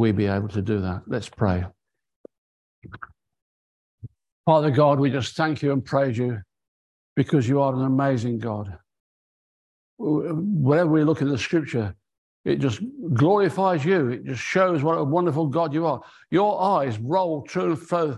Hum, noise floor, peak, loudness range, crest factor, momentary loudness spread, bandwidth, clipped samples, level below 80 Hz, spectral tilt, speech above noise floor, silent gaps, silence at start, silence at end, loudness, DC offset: none; -44 dBFS; -6 dBFS; 6 LU; 18 dB; 11 LU; 11 kHz; under 0.1%; -50 dBFS; -7.5 dB/octave; 22 dB; 2.16-2.24 s, 2.38-2.82 s, 3.42-3.98 s, 4.32-4.44 s, 6.68-7.16 s, 9.00-9.97 s, 12.18-12.44 s; 0 s; 0 s; -23 LUFS; under 0.1%